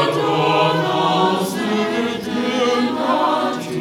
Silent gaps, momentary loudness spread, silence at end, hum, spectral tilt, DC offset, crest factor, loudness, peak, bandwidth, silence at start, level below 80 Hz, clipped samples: none; 5 LU; 0 s; none; -5 dB/octave; under 0.1%; 14 dB; -18 LUFS; -4 dBFS; 18 kHz; 0 s; -60 dBFS; under 0.1%